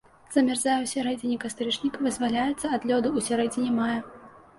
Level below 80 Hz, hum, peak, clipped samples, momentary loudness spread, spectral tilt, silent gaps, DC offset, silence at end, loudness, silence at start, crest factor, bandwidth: -60 dBFS; none; -10 dBFS; under 0.1%; 5 LU; -3.5 dB/octave; none; under 0.1%; 0.3 s; -26 LUFS; 0.3 s; 18 dB; 11.5 kHz